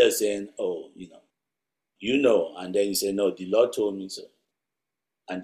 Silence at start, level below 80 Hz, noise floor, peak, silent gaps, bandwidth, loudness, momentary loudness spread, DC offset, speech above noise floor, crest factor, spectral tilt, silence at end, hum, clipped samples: 0 s; -68 dBFS; -87 dBFS; -6 dBFS; none; 15.5 kHz; -25 LUFS; 16 LU; under 0.1%; 62 dB; 22 dB; -3.5 dB/octave; 0 s; none; under 0.1%